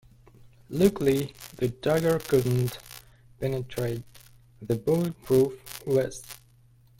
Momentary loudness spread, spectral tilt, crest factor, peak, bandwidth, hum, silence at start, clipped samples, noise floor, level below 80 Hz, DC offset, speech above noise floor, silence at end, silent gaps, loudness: 18 LU; -6.5 dB/octave; 20 dB; -8 dBFS; 17 kHz; none; 0.7 s; under 0.1%; -58 dBFS; -54 dBFS; under 0.1%; 32 dB; 0.65 s; none; -27 LUFS